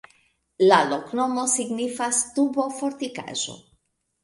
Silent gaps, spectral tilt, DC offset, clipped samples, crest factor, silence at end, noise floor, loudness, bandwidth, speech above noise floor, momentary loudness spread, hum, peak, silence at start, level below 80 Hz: none; -2.5 dB/octave; under 0.1%; under 0.1%; 22 dB; 0.65 s; -69 dBFS; -23 LUFS; 11.5 kHz; 46 dB; 11 LU; none; -4 dBFS; 0.6 s; -68 dBFS